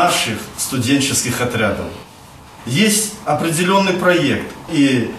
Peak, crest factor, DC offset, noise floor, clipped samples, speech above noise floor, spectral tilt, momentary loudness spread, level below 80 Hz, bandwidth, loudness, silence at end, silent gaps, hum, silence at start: 0 dBFS; 18 dB; under 0.1%; -40 dBFS; under 0.1%; 23 dB; -3.5 dB/octave; 8 LU; -48 dBFS; 14.5 kHz; -16 LUFS; 0 s; none; none; 0 s